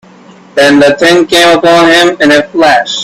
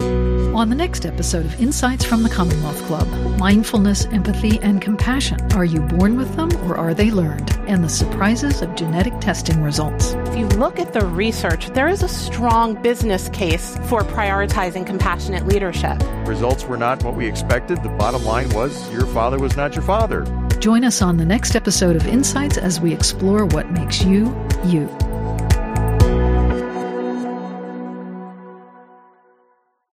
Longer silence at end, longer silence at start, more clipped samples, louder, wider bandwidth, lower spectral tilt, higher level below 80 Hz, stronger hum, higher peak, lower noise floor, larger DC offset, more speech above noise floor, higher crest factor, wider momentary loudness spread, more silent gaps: second, 0 s vs 1.35 s; first, 0.55 s vs 0 s; first, 0.9% vs under 0.1%; first, -5 LUFS vs -18 LUFS; about the same, 15.5 kHz vs 15.5 kHz; second, -3.5 dB/octave vs -5.5 dB/octave; second, -44 dBFS vs -24 dBFS; neither; about the same, 0 dBFS vs 0 dBFS; second, -35 dBFS vs -61 dBFS; neither; second, 30 dB vs 43 dB; second, 6 dB vs 18 dB; second, 3 LU vs 7 LU; neither